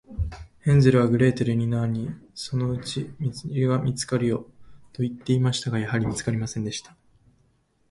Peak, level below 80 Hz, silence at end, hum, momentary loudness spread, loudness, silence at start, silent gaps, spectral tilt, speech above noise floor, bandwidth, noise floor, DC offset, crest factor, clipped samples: -4 dBFS; -44 dBFS; 1.1 s; none; 13 LU; -25 LUFS; 0.1 s; none; -6.5 dB/octave; 42 dB; 11.5 kHz; -65 dBFS; under 0.1%; 20 dB; under 0.1%